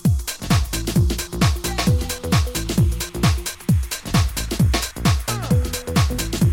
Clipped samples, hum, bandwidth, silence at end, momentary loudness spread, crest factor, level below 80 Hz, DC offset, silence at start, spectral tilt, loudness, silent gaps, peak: under 0.1%; none; 17 kHz; 0 s; 2 LU; 16 dB; -26 dBFS; under 0.1%; 0 s; -5 dB/octave; -21 LUFS; none; -4 dBFS